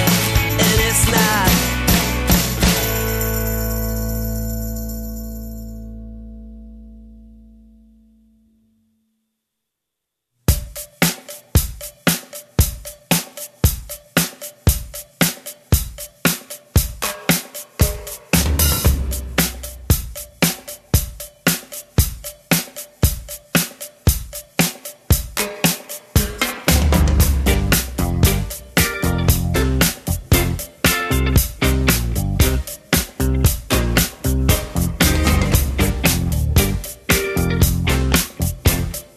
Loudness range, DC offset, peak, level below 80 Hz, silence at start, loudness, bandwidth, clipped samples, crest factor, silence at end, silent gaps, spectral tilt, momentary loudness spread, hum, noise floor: 8 LU; under 0.1%; -2 dBFS; -24 dBFS; 0 s; -18 LUFS; 14.5 kHz; under 0.1%; 18 dB; 0.1 s; none; -4 dB/octave; 13 LU; none; -80 dBFS